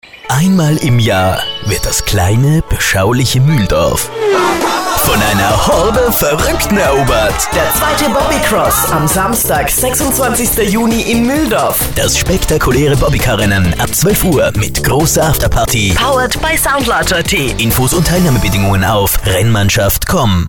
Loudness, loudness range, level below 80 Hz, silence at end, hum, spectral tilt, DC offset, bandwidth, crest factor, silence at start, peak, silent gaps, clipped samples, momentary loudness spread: -11 LUFS; 1 LU; -22 dBFS; 0 s; none; -4 dB/octave; under 0.1%; 19.5 kHz; 10 dB; 0.15 s; -2 dBFS; none; under 0.1%; 2 LU